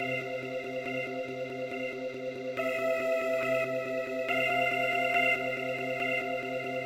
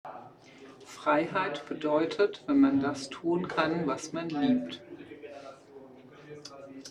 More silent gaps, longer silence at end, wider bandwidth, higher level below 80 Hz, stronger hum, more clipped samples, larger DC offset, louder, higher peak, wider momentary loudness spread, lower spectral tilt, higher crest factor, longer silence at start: neither; about the same, 0 s vs 0 s; first, 16 kHz vs 10.5 kHz; second, -74 dBFS vs -68 dBFS; neither; neither; neither; about the same, -31 LUFS vs -29 LUFS; second, -16 dBFS vs -12 dBFS; second, 9 LU vs 22 LU; about the same, -4.5 dB/octave vs -5.5 dB/octave; about the same, 16 dB vs 20 dB; about the same, 0 s vs 0.05 s